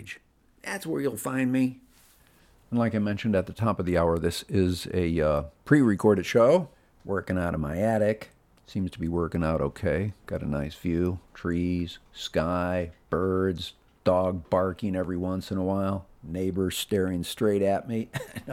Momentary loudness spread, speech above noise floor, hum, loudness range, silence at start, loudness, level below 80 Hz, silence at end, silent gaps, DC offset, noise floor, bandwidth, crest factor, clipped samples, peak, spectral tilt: 12 LU; 32 dB; none; 5 LU; 0 s; -27 LUFS; -48 dBFS; 0 s; none; under 0.1%; -59 dBFS; 16.5 kHz; 22 dB; under 0.1%; -6 dBFS; -6.5 dB/octave